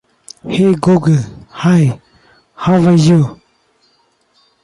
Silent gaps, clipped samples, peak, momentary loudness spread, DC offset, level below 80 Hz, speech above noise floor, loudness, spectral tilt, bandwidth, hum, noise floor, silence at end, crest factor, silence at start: none; under 0.1%; -2 dBFS; 13 LU; under 0.1%; -48 dBFS; 47 dB; -12 LUFS; -7.5 dB/octave; 11.5 kHz; none; -57 dBFS; 1.3 s; 12 dB; 0.45 s